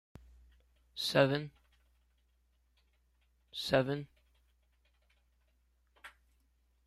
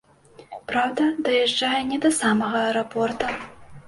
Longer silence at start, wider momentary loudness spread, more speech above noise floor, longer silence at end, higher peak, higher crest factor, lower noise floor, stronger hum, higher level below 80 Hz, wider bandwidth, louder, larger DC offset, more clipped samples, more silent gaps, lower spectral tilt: first, 0.95 s vs 0.4 s; first, 21 LU vs 13 LU; first, 42 dB vs 28 dB; first, 0.75 s vs 0.05 s; second, -14 dBFS vs -8 dBFS; first, 26 dB vs 16 dB; first, -74 dBFS vs -50 dBFS; neither; second, -66 dBFS vs -58 dBFS; first, 14.5 kHz vs 11.5 kHz; second, -33 LUFS vs -22 LUFS; neither; neither; neither; first, -5 dB/octave vs -3.5 dB/octave